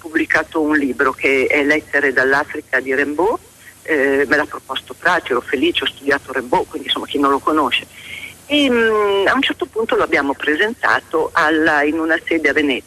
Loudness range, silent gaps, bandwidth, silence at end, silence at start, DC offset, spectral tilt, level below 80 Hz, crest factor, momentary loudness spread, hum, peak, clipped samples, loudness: 2 LU; none; 14 kHz; 0.05 s; 0.05 s; under 0.1%; -3.5 dB/octave; -50 dBFS; 14 dB; 6 LU; none; -4 dBFS; under 0.1%; -16 LUFS